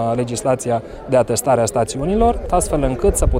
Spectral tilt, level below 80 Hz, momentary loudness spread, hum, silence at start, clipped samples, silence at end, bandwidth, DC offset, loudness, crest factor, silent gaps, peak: -5.5 dB/octave; -26 dBFS; 4 LU; none; 0 s; under 0.1%; 0 s; 16.5 kHz; under 0.1%; -18 LUFS; 16 dB; none; -2 dBFS